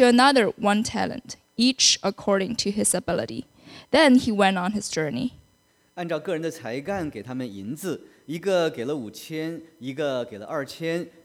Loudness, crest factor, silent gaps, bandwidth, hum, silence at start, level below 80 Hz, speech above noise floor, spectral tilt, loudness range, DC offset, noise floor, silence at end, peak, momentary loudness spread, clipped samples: -24 LUFS; 20 dB; none; 15 kHz; none; 0 s; -58 dBFS; 40 dB; -3.5 dB/octave; 9 LU; under 0.1%; -63 dBFS; 0.15 s; -4 dBFS; 16 LU; under 0.1%